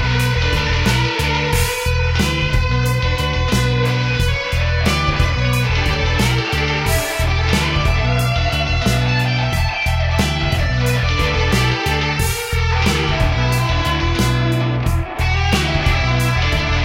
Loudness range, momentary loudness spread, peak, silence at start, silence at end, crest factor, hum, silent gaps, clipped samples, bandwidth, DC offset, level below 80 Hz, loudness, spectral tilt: 0 LU; 2 LU; 0 dBFS; 0 s; 0 s; 16 dB; none; none; under 0.1%; 16.5 kHz; under 0.1%; -22 dBFS; -17 LUFS; -5 dB/octave